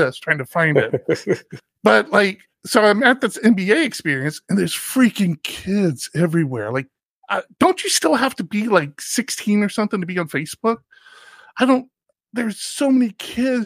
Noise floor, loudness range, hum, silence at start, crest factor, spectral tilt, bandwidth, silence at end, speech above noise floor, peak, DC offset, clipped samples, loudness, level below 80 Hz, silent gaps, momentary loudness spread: -46 dBFS; 5 LU; none; 0 s; 18 dB; -4.5 dB/octave; 15.5 kHz; 0 s; 28 dB; -2 dBFS; under 0.1%; under 0.1%; -19 LUFS; -60 dBFS; 7.05-7.22 s; 10 LU